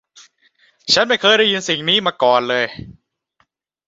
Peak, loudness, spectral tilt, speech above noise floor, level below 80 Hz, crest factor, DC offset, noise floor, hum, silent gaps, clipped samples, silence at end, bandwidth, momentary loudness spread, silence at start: -2 dBFS; -15 LUFS; -2.5 dB/octave; 48 dB; -56 dBFS; 18 dB; under 0.1%; -64 dBFS; none; none; under 0.1%; 0.95 s; 8 kHz; 11 LU; 0.85 s